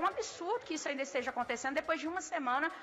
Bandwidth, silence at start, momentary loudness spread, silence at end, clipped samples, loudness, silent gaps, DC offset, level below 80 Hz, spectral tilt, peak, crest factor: 14 kHz; 0 s; 4 LU; 0 s; under 0.1%; -36 LUFS; none; under 0.1%; -72 dBFS; -2 dB/octave; -22 dBFS; 14 dB